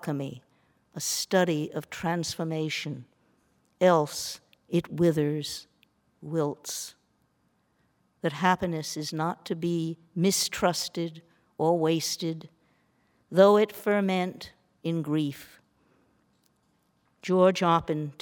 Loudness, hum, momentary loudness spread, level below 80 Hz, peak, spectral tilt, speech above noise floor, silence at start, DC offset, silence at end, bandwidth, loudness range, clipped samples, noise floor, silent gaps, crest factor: -27 LUFS; none; 15 LU; -64 dBFS; -6 dBFS; -5 dB/octave; 44 dB; 0 s; under 0.1%; 0.1 s; 19.5 kHz; 6 LU; under 0.1%; -71 dBFS; none; 22 dB